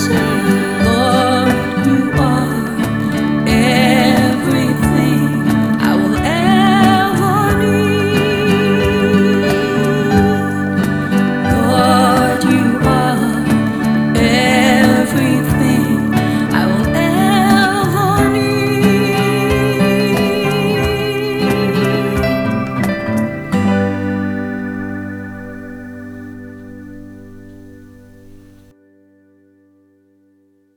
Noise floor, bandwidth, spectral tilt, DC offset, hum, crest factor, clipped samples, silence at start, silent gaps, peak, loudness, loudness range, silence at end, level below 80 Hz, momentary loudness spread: -55 dBFS; 19.5 kHz; -6 dB/octave; under 0.1%; none; 14 dB; under 0.1%; 0 s; none; 0 dBFS; -13 LUFS; 7 LU; 2.9 s; -36 dBFS; 9 LU